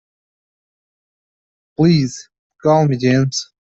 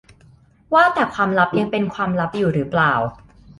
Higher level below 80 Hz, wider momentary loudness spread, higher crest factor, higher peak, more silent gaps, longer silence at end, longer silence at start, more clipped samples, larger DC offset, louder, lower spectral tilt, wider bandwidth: about the same, -54 dBFS vs -52 dBFS; first, 12 LU vs 6 LU; about the same, 16 dB vs 18 dB; about the same, -2 dBFS vs -2 dBFS; first, 2.39-2.50 s vs none; second, 0.3 s vs 0.45 s; first, 1.8 s vs 0.7 s; neither; neither; first, -16 LUFS vs -19 LUFS; about the same, -6 dB/octave vs -7 dB/octave; second, 8 kHz vs 11.5 kHz